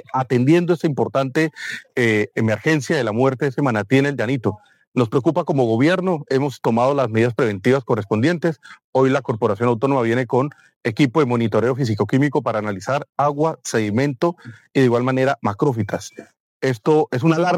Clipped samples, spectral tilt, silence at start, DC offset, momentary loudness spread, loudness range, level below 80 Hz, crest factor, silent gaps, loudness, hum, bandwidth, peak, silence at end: under 0.1%; -7 dB/octave; 0.15 s; under 0.1%; 7 LU; 2 LU; -66 dBFS; 14 dB; 4.87-4.92 s, 8.84-8.93 s, 10.76-10.81 s, 16.40-16.60 s; -19 LUFS; none; 14 kHz; -4 dBFS; 0 s